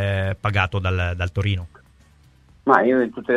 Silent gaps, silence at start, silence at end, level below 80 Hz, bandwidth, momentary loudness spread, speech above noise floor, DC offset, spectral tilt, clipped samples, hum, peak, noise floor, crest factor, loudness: none; 0 s; 0 s; -42 dBFS; 7.2 kHz; 10 LU; 33 dB; under 0.1%; -7.5 dB/octave; under 0.1%; none; 0 dBFS; -53 dBFS; 22 dB; -21 LUFS